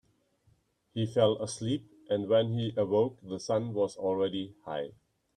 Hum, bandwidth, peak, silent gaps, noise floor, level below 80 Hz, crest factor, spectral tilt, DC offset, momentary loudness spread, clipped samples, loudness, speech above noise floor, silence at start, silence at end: none; 10.5 kHz; -12 dBFS; none; -69 dBFS; -68 dBFS; 20 dB; -6 dB/octave; under 0.1%; 11 LU; under 0.1%; -31 LUFS; 39 dB; 0.95 s; 0.45 s